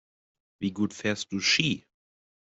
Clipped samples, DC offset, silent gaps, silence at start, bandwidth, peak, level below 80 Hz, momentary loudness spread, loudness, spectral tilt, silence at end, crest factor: under 0.1%; under 0.1%; none; 0.6 s; 8.2 kHz; -8 dBFS; -66 dBFS; 11 LU; -27 LUFS; -3.5 dB/octave; 0.75 s; 24 dB